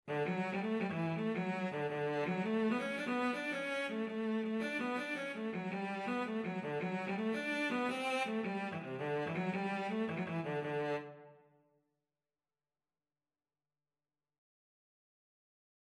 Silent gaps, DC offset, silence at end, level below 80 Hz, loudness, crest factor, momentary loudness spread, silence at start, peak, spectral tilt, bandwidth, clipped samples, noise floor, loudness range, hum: none; under 0.1%; 4.5 s; -86 dBFS; -38 LUFS; 16 dB; 4 LU; 0.05 s; -24 dBFS; -6.5 dB/octave; 12.5 kHz; under 0.1%; under -90 dBFS; 5 LU; none